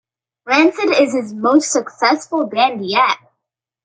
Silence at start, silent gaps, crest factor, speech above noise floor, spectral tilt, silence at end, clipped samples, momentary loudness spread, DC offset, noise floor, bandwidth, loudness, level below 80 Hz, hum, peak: 0.45 s; none; 16 dB; 64 dB; -3 dB/octave; 0.7 s; under 0.1%; 5 LU; under 0.1%; -80 dBFS; 9.4 kHz; -16 LUFS; -68 dBFS; none; -2 dBFS